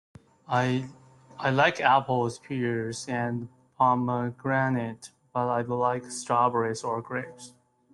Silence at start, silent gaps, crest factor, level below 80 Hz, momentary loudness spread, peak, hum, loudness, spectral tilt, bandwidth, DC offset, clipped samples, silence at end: 0.5 s; none; 20 dB; -68 dBFS; 12 LU; -8 dBFS; none; -27 LUFS; -5.5 dB/octave; 12 kHz; under 0.1%; under 0.1%; 0.45 s